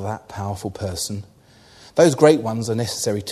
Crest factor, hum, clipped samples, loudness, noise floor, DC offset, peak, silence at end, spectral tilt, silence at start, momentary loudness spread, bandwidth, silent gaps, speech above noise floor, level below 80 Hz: 20 dB; none; under 0.1%; -20 LUFS; -50 dBFS; under 0.1%; 0 dBFS; 0 s; -5 dB/octave; 0 s; 15 LU; 13.5 kHz; none; 30 dB; -54 dBFS